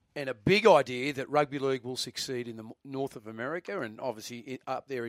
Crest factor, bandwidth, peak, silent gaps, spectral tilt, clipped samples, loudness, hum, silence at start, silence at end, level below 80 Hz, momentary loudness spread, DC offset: 24 dB; 15.5 kHz; -8 dBFS; none; -4.5 dB/octave; under 0.1%; -30 LUFS; none; 0.15 s; 0 s; -66 dBFS; 18 LU; under 0.1%